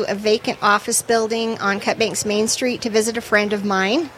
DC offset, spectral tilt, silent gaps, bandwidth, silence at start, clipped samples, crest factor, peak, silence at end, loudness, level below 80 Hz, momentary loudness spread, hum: under 0.1%; -3 dB/octave; none; 16 kHz; 0 s; under 0.1%; 16 dB; -4 dBFS; 0 s; -19 LUFS; -56 dBFS; 3 LU; none